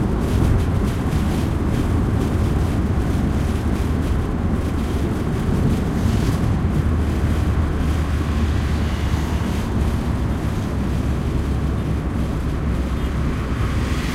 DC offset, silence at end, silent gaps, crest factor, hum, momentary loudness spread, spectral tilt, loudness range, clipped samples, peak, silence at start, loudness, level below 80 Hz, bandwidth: under 0.1%; 0 s; none; 14 dB; none; 3 LU; -7.5 dB/octave; 2 LU; under 0.1%; -6 dBFS; 0 s; -21 LUFS; -24 dBFS; 14.5 kHz